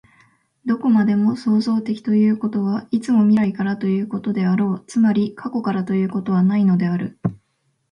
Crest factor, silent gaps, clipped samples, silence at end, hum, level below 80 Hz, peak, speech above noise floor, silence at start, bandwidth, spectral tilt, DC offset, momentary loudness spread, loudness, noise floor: 12 dB; none; under 0.1%; 0.55 s; none; -62 dBFS; -6 dBFS; 50 dB; 0.65 s; 9.6 kHz; -8.5 dB/octave; under 0.1%; 7 LU; -19 LUFS; -68 dBFS